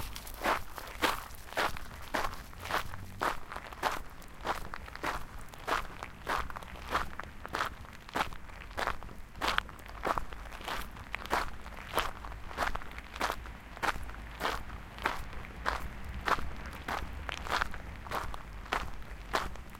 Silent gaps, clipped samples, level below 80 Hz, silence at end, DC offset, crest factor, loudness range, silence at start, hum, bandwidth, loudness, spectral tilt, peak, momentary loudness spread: none; under 0.1%; -46 dBFS; 0 s; under 0.1%; 28 dB; 2 LU; 0 s; none; 17 kHz; -37 LUFS; -3.5 dB/octave; -8 dBFS; 12 LU